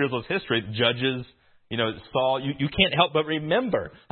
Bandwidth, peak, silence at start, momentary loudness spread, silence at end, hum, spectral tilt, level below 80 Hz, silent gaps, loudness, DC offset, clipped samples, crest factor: 4.4 kHz; -2 dBFS; 0 s; 7 LU; 0.15 s; none; -10 dB/octave; -52 dBFS; none; -25 LUFS; under 0.1%; under 0.1%; 22 dB